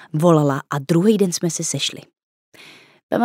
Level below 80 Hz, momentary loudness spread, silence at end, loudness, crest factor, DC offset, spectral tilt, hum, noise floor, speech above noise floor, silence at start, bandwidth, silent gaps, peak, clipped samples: -70 dBFS; 9 LU; 0 s; -19 LUFS; 18 dB; under 0.1%; -5 dB/octave; none; -46 dBFS; 28 dB; 0 s; 16 kHz; 2.23-2.52 s, 3.03-3.09 s; 0 dBFS; under 0.1%